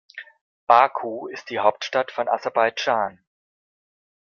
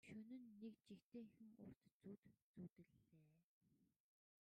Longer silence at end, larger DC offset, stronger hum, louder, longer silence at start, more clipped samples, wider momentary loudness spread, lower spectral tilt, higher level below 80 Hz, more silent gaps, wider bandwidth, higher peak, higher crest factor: first, 1.2 s vs 0.6 s; neither; neither; first, -22 LUFS vs -63 LUFS; about the same, 0.15 s vs 0.05 s; neither; first, 17 LU vs 7 LU; second, -3.5 dB/octave vs -7.5 dB/octave; first, -74 dBFS vs under -90 dBFS; second, 0.41-0.67 s vs 1.02-1.12 s, 1.76-1.81 s, 1.92-2.00 s, 2.18-2.23 s, 2.42-2.54 s, 2.72-2.76 s, 3.44-3.61 s; second, 7 kHz vs 9 kHz; first, -2 dBFS vs -48 dBFS; first, 22 dB vs 16 dB